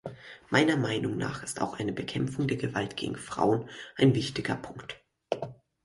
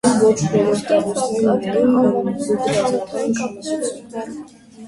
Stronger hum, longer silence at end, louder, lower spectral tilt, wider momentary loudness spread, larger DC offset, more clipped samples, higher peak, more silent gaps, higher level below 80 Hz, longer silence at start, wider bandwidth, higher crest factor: neither; first, 0.3 s vs 0 s; second, -30 LUFS vs -18 LUFS; about the same, -5.5 dB/octave vs -5.5 dB/octave; first, 17 LU vs 13 LU; neither; neither; second, -10 dBFS vs -2 dBFS; neither; second, -60 dBFS vs -54 dBFS; about the same, 0.05 s vs 0.05 s; about the same, 11.5 kHz vs 11.5 kHz; about the same, 20 dB vs 16 dB